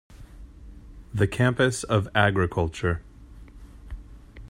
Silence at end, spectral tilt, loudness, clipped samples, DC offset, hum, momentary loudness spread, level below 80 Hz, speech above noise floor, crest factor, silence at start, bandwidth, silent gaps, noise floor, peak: 0 s; -5.5 dB/octave; -24 LUFS; under 0.1%; under 0.1%; none; 22 LU; -44 dBFS; 22 dB; 20 dB; 0.1 s; 15 kHz; none; -46 dBFS; -6 dBFS